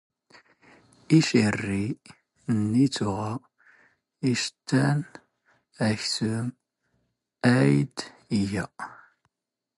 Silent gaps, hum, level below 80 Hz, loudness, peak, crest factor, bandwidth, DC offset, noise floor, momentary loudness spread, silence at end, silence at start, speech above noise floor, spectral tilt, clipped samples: none; none; -58 dBFS; -26 LUFS; -8 dBFS; 20 dB; 11.5 kHz; under 0.1%; -87 dBFS; 16 LU; 0.85 s; 1.1 s; 62 dB; -5.5 dB/octave; under 0.1%